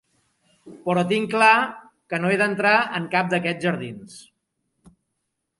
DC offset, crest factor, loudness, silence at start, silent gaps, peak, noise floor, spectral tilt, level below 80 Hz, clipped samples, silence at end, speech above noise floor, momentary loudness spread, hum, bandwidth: under 0.1%; 22 dB; -21 LUFS; 0.65 s; none; -2 dBFS; -78 dBFS; -5.5 dB/octave; -70 dBFS; under 0.1%; 1.4 s; 56 dB; 14 LU; none; 11.5 kHz